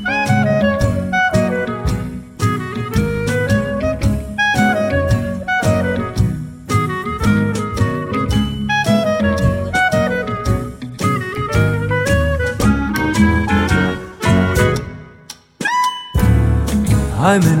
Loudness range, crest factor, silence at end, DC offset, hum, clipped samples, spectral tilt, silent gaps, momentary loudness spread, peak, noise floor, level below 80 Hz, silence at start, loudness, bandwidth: 2 LU; 14 dB; 0 s; under 0.1%; none; under 0.1%; -6 dB/octave; none; 6 LU; -2 dBFS; -39 dBFS; -26 dBFS; 0 s; -17 LUFS; 16.5 kHz